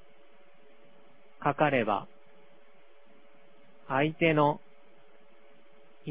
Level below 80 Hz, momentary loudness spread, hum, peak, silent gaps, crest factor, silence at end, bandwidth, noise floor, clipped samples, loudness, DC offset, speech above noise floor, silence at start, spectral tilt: -70 dBFS; 15 LU; none; -10 dBFS; none; 24 dB; 0 s; 4 kHz; -62 dBFS; under 0.1%; -28 LUFS; 0.4%; 35 dB; 1.4 s; -4.5 dB/octave